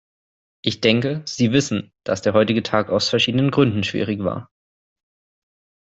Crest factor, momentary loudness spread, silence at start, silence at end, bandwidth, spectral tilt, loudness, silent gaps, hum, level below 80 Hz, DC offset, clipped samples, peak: 18 dB; 9 LU; 0.65 s; 1.45 s; 8.2 kHz; -5.5 dB/octave; -20 LUFS; none; none; -58 dBFS; under 0.1%; under 0.1%; -2 dBFS